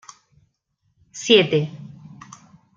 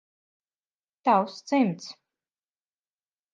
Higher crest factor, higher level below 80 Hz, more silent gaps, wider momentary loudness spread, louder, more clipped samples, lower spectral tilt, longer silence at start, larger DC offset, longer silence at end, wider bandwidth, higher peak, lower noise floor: about the same, 22 dB vs 20 dB; first, -66 dBFS vs -86 dBFS; neither; first, 26 LU vs 14 LU; first, -18 LUFS vs -25 LUFS; neither; second, -4.5 dB/octave vs -6 dB/octave; about the same, 1.15 s vs 1.05 s; neither; second, 0.9 s vs 1.4 s; about the same, 7.6 kHz vs 7.6 kHz; first, -2 dBFS vs -10 dBFS; second, -70 dBFS vs under -90 dBFS